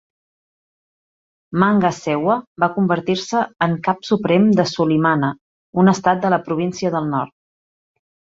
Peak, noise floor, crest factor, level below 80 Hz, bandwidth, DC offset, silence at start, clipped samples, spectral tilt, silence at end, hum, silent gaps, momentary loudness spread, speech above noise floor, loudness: 0 dBFS; under -90 dBFS; 18 dB; -58 dBFS; 7.8 kHz; under 0.1%; 1.5 s; under 0.1%; -6.5 dB/octave; 1.1 s; none; 2.47-2.56 s, 5.41-5.73 s; 8 LU; over 73 dB; -18 LUFS